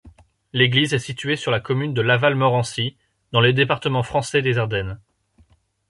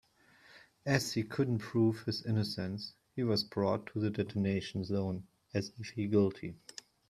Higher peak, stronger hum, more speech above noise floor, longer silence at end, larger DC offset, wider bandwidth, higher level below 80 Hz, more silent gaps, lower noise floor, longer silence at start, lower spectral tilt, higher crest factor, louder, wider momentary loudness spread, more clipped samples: first, -2 dBFS vs -14 dBFS; neither; first, 38 dB vs 30 dB; first, 0.95 s vs 0.55 s; neither; second, 11.5 kHz vs 15 kHz; first, -50 dBFS vs -68 dBFS; neither; second, -58 dBFS vs -63 dBFS; second, 0.05 s vs 0.55 s; about the same, -5.5 dB/octave vs -6 dB/octave; about the same, 18 dB vs 22 dB; first, -20 LUFS vs -35 LUFS; about the same, 10 LU vs 12 LU; neither